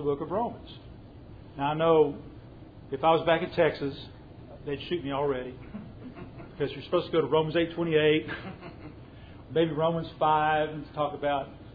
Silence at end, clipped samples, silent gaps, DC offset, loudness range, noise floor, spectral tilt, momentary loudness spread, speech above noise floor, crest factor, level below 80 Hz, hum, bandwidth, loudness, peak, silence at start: 0 s; under 0.1%; none; under 0.1%; 5 LU; -47 dBFS; -9 dB/octave; 24 LU; 20 dB; 18 dB; -54 dBFS; none; 5 kHz; -28 LUFS; -10 dBFS; 0 s